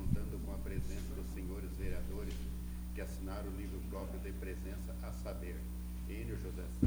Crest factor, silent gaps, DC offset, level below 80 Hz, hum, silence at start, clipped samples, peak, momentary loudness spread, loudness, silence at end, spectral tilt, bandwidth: 22 dB; none; under 0.1%; -42 dBFS; 60 Hz at -45 dBFS; 0 s; under 0.1%; -16 dBFS; 2 LU; -44 LUFS; 0 s; -7 dB/octave; over 20 kHz